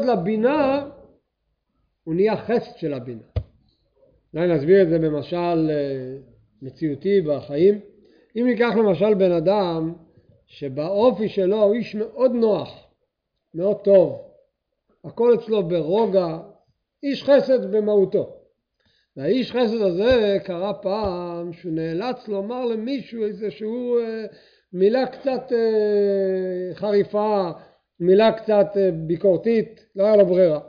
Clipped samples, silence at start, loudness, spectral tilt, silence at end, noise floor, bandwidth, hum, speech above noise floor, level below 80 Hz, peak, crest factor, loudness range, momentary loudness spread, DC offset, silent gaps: under 0.1%; 0 s; -21 LUFS; -9 dB/octave; 0 s; -75 dBFS; 5.2 kHz; none; 55 dB; -52 dBFS; -4 dBFS; 16 dB; 5 LU; 15 LU; under 0.1%; none